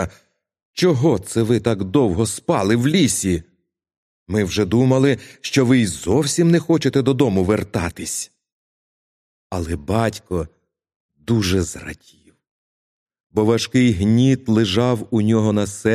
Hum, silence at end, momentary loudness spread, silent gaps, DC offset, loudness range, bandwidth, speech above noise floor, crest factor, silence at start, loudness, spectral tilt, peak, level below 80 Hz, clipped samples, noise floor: none; 0 s; 11 LU; 0.62-0.74 s, 3.97-4.26 s, 8.52-9.50 s, 10.96-11.09 s, 12.51-13.06 s, 13.20-13.30 s; under 0.1%; 8 LU; 14.5 kHz; 39 dB; 18 dB; 0 s; -18 LUFS; -5.5 dB/octave; -2 dBFS; -44 dBFS; under 0.1%; -56 dBFS